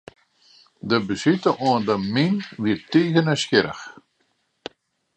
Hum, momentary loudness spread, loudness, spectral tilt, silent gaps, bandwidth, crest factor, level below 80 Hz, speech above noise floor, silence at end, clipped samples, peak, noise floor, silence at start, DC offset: none; 21 LU; -21 LUFS; -5.5 dB/octave; none; 9.2 kHz; 20 dB; -60 dBFS; 48 dB; 1.25 s; under 0.1%; -2 dBFS; -69 dBFS; 0.85 s; under 0.1%